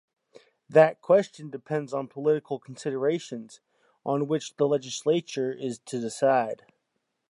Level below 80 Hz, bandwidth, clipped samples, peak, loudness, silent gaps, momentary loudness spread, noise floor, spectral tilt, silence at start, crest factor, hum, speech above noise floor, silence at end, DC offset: -82 dBFS; 11.5 kHz; under 0.1%; -6 dBFS; -27 LUFS; none; 16 LU; -79 dBFS; -5.5 dB/octave; 0.7 s; 22 dB; none; 53 dB; 0.75 s; under 0.1%